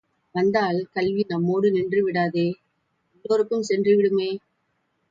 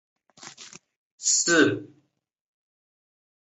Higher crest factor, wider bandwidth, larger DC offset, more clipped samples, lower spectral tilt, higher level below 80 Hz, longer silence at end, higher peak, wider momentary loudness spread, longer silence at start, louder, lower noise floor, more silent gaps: second, 16 dB vs 22 dB; about the same, 7.8 kHz vs 8.4 kHz; neither; neither; first, -6.5 dB/octave vs -2 dB/octave; first, -64 dBFS vs -72 dBFS; second, 0.75 s vs 1.6 s; about the same, -8 dBFS vs -6 dBFS; second, 10 LU vs 25 LU; about the same, 0.35 s vs 0.45 s; about the same, -23 LUFS vs -21 LUFS; first, -72 dBFS vs -67 dBFS; second, none vs 0.96-1.18 s